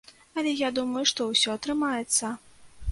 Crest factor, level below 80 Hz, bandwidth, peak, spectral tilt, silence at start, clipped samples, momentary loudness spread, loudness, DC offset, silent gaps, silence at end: 20 dB; -58 dBFS; 12 kHz; -8 dBFS; -2 dB/octave; 0.35 s; under 0.1%; 12 LU; -26 LUFS; under 0.1%; none; 0 s